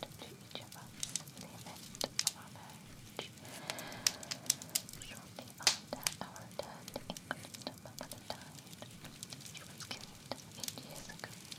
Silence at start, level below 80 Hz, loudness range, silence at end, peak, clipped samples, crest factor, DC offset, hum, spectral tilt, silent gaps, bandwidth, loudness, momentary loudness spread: 0 s; -68 dBFS; 10 LU; 0 s; -10 dBFS; under 0.1%; 34 dB; under 0.1%; none; -1.5 dB/octave; none; 18 kHz; -41 LUFS; 16 LU